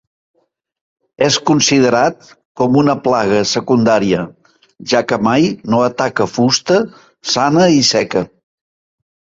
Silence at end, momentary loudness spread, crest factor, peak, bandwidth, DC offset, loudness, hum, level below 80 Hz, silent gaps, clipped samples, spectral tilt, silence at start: 1.1 s; 8 LU; 14 dB; 0 dBFS; 8 kHz; under 0.1%; -13 LUFS; none; -52 dBFS; 2.45-2.55 s; under 0.1%; -4.5 dB/octave; 1.2 s